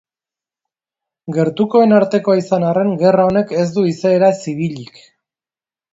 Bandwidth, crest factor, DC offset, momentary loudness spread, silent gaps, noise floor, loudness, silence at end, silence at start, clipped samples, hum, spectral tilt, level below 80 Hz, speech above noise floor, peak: 7.8 kHz; 16 dB; under 0.1%; 11 LU; none; under -90 dBFS; -15 LUFS; 1.1 s; 1.25 s; under 0.1%; none; -7.5 dB/octave; -56 dBFS; over 76 dB; 0 dBFS